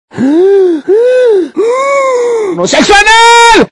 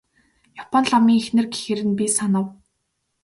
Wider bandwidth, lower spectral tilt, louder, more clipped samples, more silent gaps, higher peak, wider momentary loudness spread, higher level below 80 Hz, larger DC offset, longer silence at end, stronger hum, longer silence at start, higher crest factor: about the same, 12 kHz vs 11.5 kHz; second, -3 dB/octave vs -4.5 dB/octave; first, -6 LUFS vs -20 LUFS; first, 1% vs under 0.1%; neither; first, 0 dBFS vs -4 dBFS; about the same, 8 LU vs 8 LU; first, -34 dBFS vs -62 dBFS; neither; second, 0.05 s vs 0.7 s; neither; second, 0.15 s vs 0.55 s; second, 6 dB vs 16 dB